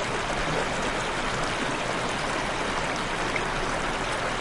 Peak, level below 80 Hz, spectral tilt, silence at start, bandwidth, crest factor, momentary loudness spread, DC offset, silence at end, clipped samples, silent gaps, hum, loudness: -12 dBFS; -40 dBFS; -3.5 dB/octave; 0 s; 11.5 kHz; 16 dB; 1 LU; under 0.1%; 0 s; under 0.1%; none; none; -27 LUFS